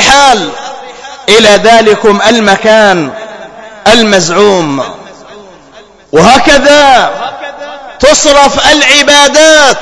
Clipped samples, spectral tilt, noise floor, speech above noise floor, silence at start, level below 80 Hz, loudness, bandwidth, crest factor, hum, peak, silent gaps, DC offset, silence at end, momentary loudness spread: 10%; -2.5 dB/octave; -35 dBFS; 31 dB; 0 s; -32 dBFS; -4 LUFS; 11 kHz; 6 dB; none; 0 dBFS; none; under 0.1%; 0 s; 19 LU